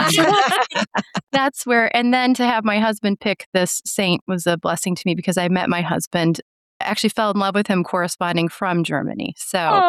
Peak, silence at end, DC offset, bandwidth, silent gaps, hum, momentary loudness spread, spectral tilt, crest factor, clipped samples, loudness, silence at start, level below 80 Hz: -4 dBFS; 0 s; under 0.1%; 15 kHz; 3.46-3.53 s, 4.21-4.26 s, 6.07-6.11 s, 6.42-6.80 s; none; 6 LU; -4 dB/octave; 14 dB; under 0.1%; -19 LUFS; 0 s; -62 dBFS